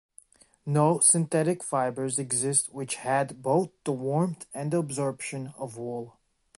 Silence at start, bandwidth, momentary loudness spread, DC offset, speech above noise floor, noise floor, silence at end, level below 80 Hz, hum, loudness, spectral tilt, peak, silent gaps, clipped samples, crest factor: 0.65 s; 11.5 kHz; 16 LU; under 0.1%; 30 dB; -57 dBFS; 0.5 s; -72 dBFS; none; -27 LUFS; -4.5 dB/octave; -8 dBFS; none; under 0.1%; 20 dB